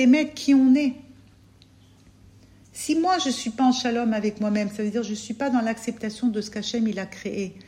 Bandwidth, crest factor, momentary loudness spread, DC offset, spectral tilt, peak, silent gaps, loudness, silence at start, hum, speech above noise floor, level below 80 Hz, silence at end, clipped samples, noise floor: 13.5 kHz; 16 dB; 12 LU; under 0.1%; -4.5 dB/octave; -8 dBFS; none; -24 LUFS; 0 s; none; 31 dB; -60 dBFS; 0.05 s; under 0.1%; -53 dBFS